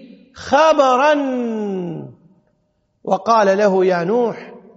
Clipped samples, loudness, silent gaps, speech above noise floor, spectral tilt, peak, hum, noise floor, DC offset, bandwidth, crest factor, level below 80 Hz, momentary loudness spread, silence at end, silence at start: under 0.1%; -16 LUFS; none; 50 dB; -4 dB/octave; 0 dBFS; none; -65 dBFS; under 0.1%; 8 kHz; 18 dB; -62 dBFS; 18 LU; 0.15 s; 0 s